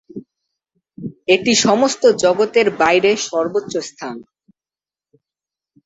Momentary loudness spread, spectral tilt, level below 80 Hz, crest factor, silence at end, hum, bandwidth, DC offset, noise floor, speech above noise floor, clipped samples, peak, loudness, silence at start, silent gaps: 20 LU; -3 dB/octave; -60 dBFS; 18 dB; 1.65 s; none; 8.2 kHz; under 0.1%; under -90 dBFS; over 74 dB; under 0.1%; -2 dBFS; -15 LUFS; 0.15 s; none